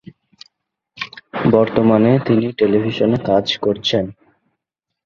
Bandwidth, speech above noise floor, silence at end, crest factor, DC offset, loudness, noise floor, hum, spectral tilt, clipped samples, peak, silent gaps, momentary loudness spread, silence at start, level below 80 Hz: 7.2 kHz; 65 dB; 0.95 s; 18 dB; under 0.1%; -16 LUFS; -80 dBFS; none; -7 dB/octave; under 0.1%; 0 dBFS; none; 15 LU; 1 s; -50 dBFS